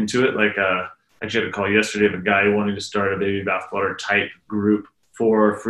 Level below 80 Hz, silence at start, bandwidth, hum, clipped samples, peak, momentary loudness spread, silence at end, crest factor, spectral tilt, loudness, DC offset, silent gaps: -58 dBFS; 0 s; 12 kHz; none; under 0.1%; -4 dBFS; 7 LU; 0 s; 18 dB; -5 dB/octave; -20 LUFS; under 0.1%; none